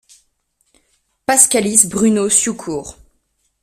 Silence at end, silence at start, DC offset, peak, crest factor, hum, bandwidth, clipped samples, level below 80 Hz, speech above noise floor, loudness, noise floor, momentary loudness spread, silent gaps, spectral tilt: 0.7 s; 1.3 s; under 0.1%; 0 dBFS; 18 dB; none; 16 kHz; under 0.1%; -52 dBFS; 51 dB; -13 LUFS; -65 dBFS; 16 LU; none; -2.5 dB/octave